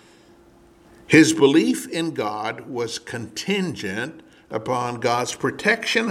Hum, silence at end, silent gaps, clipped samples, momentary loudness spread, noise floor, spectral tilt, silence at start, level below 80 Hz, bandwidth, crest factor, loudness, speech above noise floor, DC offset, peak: none; 0 s; none; under 0.1%; 15 LU; -52 dBFS; -4.5 dB/octave; 1.1 s; -62 dBFS; 15 kHz; 22 dB; -21 LUFS; 31 dB; under 0.1%; 0 dBFS